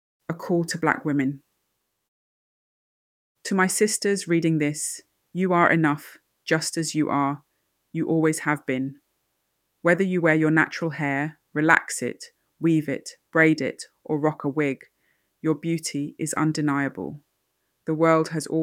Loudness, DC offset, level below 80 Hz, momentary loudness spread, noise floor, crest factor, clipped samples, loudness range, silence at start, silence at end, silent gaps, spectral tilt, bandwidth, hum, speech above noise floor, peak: -24 LUFS; under 0.1%; -70 dBFS; 15 LU; -76 dBFS; 24 dB; under 0.1%; 5 LU; 0.3 s; 0 s; 2.08-3.35 s; -5 dB/octave; 16 kHz; none; 53 dB; -2 dBFS